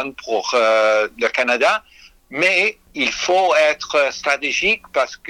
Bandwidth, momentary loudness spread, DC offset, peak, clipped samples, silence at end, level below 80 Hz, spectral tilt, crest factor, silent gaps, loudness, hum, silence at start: 13.5 kHz; 7 LU; under 0.1%; -2 dBFS; under 0.1%; 0 s; -54 dBFS; -1.5 dB/octave; 16 dB; none; -17 LUFS; none; 0 s